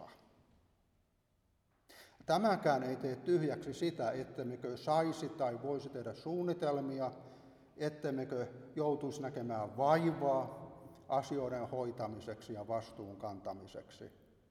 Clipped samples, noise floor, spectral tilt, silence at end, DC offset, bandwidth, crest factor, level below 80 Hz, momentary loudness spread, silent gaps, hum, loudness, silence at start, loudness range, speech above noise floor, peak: under 0.1%; -77 dBFS; -6.5 dB/octave; 0.4 s; under 0.1%; 14 kHz; 22 dB; -74 dBFS; 17 LU; none; none; -38 LUFS; 0 s; 5 LU; 39 dB; -18 dBFS